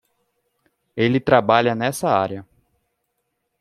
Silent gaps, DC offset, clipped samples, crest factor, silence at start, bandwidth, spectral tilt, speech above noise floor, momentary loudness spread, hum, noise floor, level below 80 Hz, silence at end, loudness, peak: none; under 0.1%; under 0.1%; 20 dB; 0.95 s; 14.5 kHz; -5.5 dB/octave; 56 dB; 14 LU; none; -74 dBFS; -58 dBFS; 1.15 s; -19 LUFS; -2 dBFS